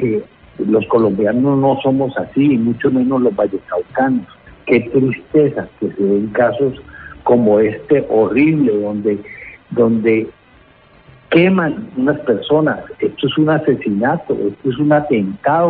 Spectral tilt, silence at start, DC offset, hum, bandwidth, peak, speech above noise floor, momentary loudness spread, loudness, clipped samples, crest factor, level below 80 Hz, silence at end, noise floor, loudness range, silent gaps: -12.5 dB/octave; 0 s; under 0.1%; none; 4.5 kHz; 0 dBFS; 33 dB; 9 LU; -15 LUFS; under 0.1%; 14 dB; -50 dBFS; 0 s; -47 dBFS; 2 LU; none